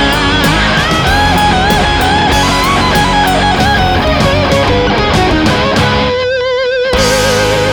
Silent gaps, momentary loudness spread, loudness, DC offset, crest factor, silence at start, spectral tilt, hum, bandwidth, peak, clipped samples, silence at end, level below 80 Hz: none; 2 LU; -10 LUFS; under 0.1%; 10 dB; 0 s; -4.5 dB/octave; none; over 20 kHz; 0 dBFS; under 0.1%; 0 s; -20 dBFS